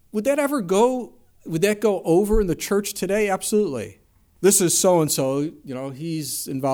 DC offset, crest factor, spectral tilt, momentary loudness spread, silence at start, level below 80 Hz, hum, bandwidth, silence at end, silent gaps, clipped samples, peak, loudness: under 0.1%; 16 dB; -4 dB/octave; 13 LU; 0.15 s; -38 dBFS; none; over 20 kHz; 0 s; none; under 0.1%; -4 dBFS; -21 LUFS